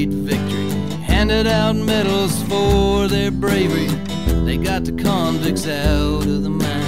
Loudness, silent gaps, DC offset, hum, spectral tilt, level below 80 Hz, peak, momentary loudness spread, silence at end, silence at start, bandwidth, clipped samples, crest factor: -18 LUFS; none; 2%; none; -5.5 dB/octave; -26 dBFS; -4 dBFS; 5 LU; 0 s; 0 s; 16 kHz; under 0.1%; 12 dB